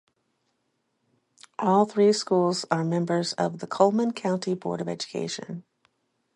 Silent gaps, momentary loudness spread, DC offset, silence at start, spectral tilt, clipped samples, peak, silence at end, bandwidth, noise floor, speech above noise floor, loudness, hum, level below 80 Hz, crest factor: none; 11 LU; under 0.1%; 1.6 s; -5.5 dB/octave; under 0.1%; -6 dBFS; 0.75 s; 11 kHz; -75 dBFS; 50 dB; -25 LUFS; none; -74 dBFS; 22 dB